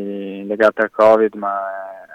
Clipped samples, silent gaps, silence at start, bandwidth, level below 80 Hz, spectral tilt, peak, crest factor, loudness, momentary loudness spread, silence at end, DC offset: under 0.1%; none; 0 s; 8.8 kHz; -64 dBFS; -6.5 dB/octave; -2 dBFS; 14 dB; -16 LUFS; 15 LU; 0 s; under 0.1%